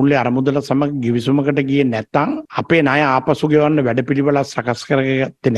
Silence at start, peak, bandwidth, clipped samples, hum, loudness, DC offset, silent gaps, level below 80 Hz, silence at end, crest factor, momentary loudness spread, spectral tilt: 0 s; 0 dBFS; 11.5 kHz; under 0.1%; none; -16 LUFS; under 0.1%; none; -52 dBFS; 0 s; 16 dB; 5 LU; -7 dB/octave